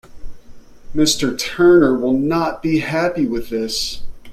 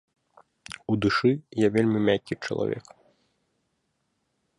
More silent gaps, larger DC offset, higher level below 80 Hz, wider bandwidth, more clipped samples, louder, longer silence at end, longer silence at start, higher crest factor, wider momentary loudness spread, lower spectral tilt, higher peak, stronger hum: neither; neither; first, -38 dBFS vs -58 dBFS; first, 15 kHz vs 11.5 kHz; neither; first, -17 LUFS vs -25 LUFS; second, 0 s vs 1.8 s; second, 0.1 s vs 0.7 s; about the same, 16 dB vs 18 dB; second, 10 LU vs 13 LU; second, -4.5 dB/octave vs -6.5 dB/octave; first, -2 dBFS vs -8 dBFS; neither